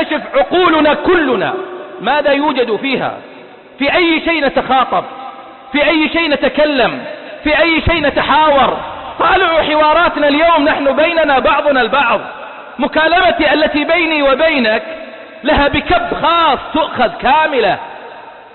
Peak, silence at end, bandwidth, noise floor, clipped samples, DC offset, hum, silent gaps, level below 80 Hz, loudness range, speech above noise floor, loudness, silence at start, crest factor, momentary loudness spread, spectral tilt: -2 dBFS; 0.15 s; 4.4 kHz; -33 dBFS; under 0.1%; under 0.1%; none; none; -36 dBFS; 4 LU; 21 dB; -12 LUFS; 0 s; 12 dB; 12 LU; -10 dB/octave